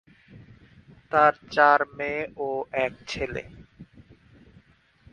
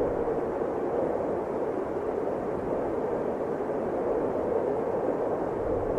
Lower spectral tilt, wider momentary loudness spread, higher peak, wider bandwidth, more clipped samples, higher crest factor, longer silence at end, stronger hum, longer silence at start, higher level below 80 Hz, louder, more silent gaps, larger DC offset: second, -5 dB/octave vs -8.5 dB/octave; first, 13 LU vs 2 LU; first, -4 dBFS vs -16 dBFS; about the same, 9.6 kHz vs 10.5 kHz; neither; first, 24 dB vs 12 dB; first, 1.3 s vs 0 s; neither; first, 0.3 s vs 0 s; second, -56 dBFS vs -50 dBFS; first, -24 LUFS vs -29 LUFS; neither; neither